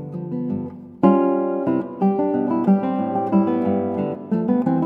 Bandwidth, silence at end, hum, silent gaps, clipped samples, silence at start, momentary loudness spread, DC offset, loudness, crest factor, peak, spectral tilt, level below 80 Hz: 3.7 kHz; 0 s; none; none; under 0.1%; 0 s; 9 LU; under 0.1%; -21 LUFS; 18 dB; -2 dBFS; -11.5 dB/octave; -66 dBFS